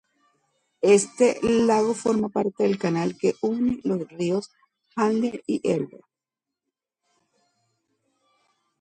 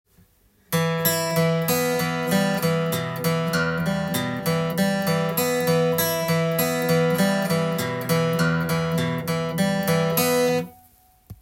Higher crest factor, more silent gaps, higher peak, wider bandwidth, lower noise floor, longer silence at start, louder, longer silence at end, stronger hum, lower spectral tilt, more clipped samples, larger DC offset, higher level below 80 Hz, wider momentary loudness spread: about the same, 20 dB vs 16 dB; neither; about the same, -6 dBFS vs -6 dBFS; second, 11 kHz vs 17 kHz; first, -88 dBFS vs -59 dBFS; about the same, 0.8 s vs 0.7 s; about the same, -23 LUFS vs -22 LUFS; first, 2.95 s vs 0.1 s; neither; about the same, -5.5 dB/octave vs -5 dB/octave; neither; neither; about the same, -62 dBFS vs -58 dBFS; first, 8 LU vs 4 LU